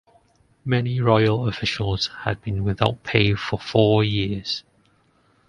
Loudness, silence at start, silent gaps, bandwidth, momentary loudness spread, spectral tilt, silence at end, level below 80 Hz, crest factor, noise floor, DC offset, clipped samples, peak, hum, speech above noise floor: -22 LUFS; 0.65 s; none; 9.8 kHz; 9 LU; -6.5 dB/octave; 0.9 s; -44 dBFS; 22 dB; -61 dBFS; under 0.1%; under 0.1%; 0 dBFS; none; 40 dB